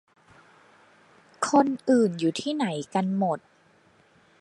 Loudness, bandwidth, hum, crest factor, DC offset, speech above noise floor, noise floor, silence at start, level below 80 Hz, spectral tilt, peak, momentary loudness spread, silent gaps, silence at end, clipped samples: -25 LUFS; 11.5 kHz; none; 20 dB; under 0.1%; 36 dB; -60 dBFS; 1.4 s; -74 dBFS; -5.5 dB/octave; -8 dBFS; 7 LU; none; 1.05 s; under 0.1%